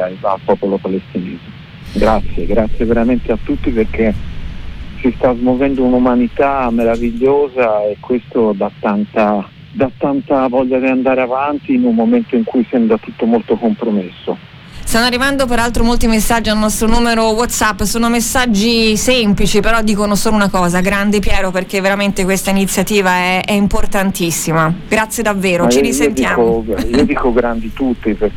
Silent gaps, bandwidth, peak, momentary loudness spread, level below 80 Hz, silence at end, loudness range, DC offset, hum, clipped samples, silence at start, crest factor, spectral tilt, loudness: none; 18 kHz; 0 dBFS; 7 LU; -26 dBFS; 0 s; 4 LU; under 0.1%; none; under 0.1%; 0 s; 12 dB; -4.5 dB/octave; -14 LUFS